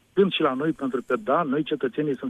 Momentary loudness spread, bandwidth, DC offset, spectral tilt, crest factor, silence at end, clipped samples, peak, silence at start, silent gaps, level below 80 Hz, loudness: 5 LU; 9.6 kHz; under 0.1%; -7.5 dB/octave; 16 dB; 0 s; under 0.1%; -8 dBFS; 0.15 s; none; -66 dBFS; -24 LUFS